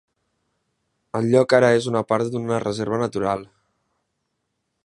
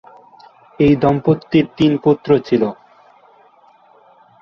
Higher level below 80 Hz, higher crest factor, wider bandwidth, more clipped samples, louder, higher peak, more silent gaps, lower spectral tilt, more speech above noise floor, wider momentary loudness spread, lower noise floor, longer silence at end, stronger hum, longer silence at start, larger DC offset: second, -60 dBFS vs -48 dBFS; first, 22 dB vs 16 dB; first, 11.5 kHz vs 6.8 kHz; neither; second, -21 LUFS vs -15 LUFS; about the same, -2 dBFS vs -2 dBFS; neither; second, -6 dB/octave vs -9 dB/octave; first, 56 dB vs 36 dB; first, 10 LU vs 5 LU; first, -76 dBFS vs -50 dBFS; second, 1.4 s vs 1.7 s; neither; first, 1.15 s vs 0.8 s; neither